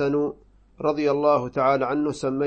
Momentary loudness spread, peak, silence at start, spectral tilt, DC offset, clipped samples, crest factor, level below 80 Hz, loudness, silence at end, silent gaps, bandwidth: 6 LU; -8 dBFS; 0 s; -7 dB/octave; under 0.1%; under 0.1%; 16 dB; -56 dBFS; -23 LUFS; 0 s; none; 8.8 kHz